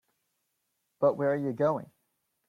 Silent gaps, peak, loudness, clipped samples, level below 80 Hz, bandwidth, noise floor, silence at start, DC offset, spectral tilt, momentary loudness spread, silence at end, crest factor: none; -12 dBFS; -29 LUFS; under 0.1%; -74 dBFS; 6.4 kHz; -80 dBFS; 1 s; under 0.1%; -9 dB/octave; 3 LU; 0.65 s; 18 dB